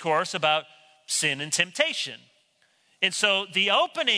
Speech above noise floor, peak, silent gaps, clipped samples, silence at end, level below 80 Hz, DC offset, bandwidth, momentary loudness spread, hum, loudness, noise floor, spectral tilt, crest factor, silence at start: 41 dB; -6 dBFS; none; under 0.1%; 0 s; -80 dBFS; under 0.1%; 11 kHz; 7 LU; none; -24 LUFS; -66 dBFS; -1 dB/octave; 22 dB; 0 s